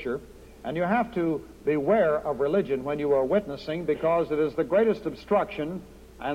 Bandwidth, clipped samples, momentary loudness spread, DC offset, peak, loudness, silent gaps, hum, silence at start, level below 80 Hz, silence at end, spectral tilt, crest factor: 15.5 kHz; under 0.1%; 11 LU; under 0.1%; -10 dBFS; -26 LUFS; none; none; 0 s; -52 dBFS; 0 s; -7.5 dB/octave; 16 dB